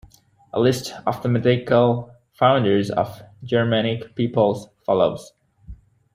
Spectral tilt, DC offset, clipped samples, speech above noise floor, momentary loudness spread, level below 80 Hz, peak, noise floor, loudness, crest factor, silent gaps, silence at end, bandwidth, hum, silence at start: -6.5 dB/octave; under 0.1%; under 0.1%; 32 dB; 10 LU; -52 dBFS; -2 dBFS; -51 dBFS; -21 LUFS; 18 dB; none; 0.4 s; 15.5 kHz; none; 0.55 s